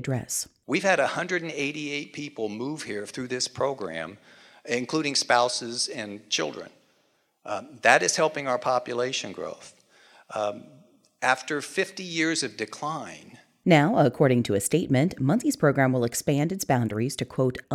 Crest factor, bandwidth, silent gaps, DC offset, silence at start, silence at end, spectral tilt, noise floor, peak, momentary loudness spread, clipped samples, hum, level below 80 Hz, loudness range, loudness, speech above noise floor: 24 dB; 16.5 kHz; none; under 0.1%; 0 s; 0 s; -4.5 dB/octave; -68 dBFS; -2 dBFS; 14 LU; under 0.1%; none; -64 dBFS; 7 LU; -26 LUFS; 43 dB